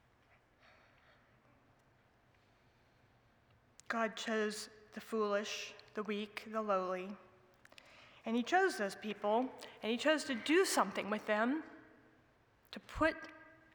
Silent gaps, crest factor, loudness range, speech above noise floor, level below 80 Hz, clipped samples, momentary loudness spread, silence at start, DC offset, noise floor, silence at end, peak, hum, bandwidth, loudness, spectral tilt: none; 22 dB; 8 LU; 34 dB; -68 dBFS; under 0.1%; 17 LU; 3.9 s; under 0.1%; -70 dBFS; 0.25 s; -18 dBFS; none; over 20 kHz; -37 LUFS; -3.5 dB/octave